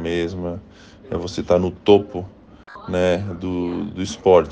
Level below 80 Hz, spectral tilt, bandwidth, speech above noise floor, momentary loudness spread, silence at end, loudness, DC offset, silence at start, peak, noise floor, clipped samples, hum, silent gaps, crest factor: -48 dBFS; -6.5 dB/octave; 9 kHz; 22 dB; 16 LU; 0 s; -21 LUFS; under 0.1%; 0 s; 0 dBFS; -42 dBFS; under 0.1%; none; none; 20 dB